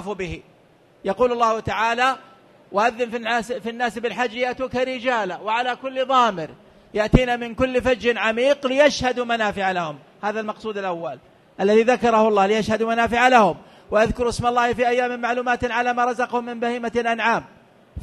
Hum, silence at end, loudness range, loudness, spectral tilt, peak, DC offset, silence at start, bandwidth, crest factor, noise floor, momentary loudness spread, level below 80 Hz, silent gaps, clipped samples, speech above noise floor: none; 0 s; 5 LU; -21 LUFS; -5 dB/octave; 0 dBFS; under 0.1%; 0 s; 12.5 kHz; 22 dB; -54 dBFS; 11 LU; -42 dBFS; none; under 0.1%; 34 dB